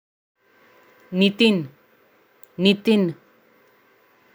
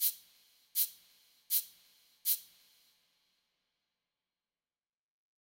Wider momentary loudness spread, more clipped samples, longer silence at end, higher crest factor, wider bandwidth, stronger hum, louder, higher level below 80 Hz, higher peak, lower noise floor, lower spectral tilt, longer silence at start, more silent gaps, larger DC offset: first, 21 LU vs 10 LU; neither; second, 1.2 s vs 3 s; second, 20 dB vs 26 dB; about the same, over 20 kHz vs 19.5 kHz; neither; first, -20 LUFS vs -34 LUFS; first, -72 dBFS vs under -90 dBFS; first, -4 dBFS vs -16 dBFS; second, -58 dBFS vs under -90 dBFS; first, -6.5 dB/octave vs 4.5 dB/octave; first, 1.1 s vs 0 s; neither; neither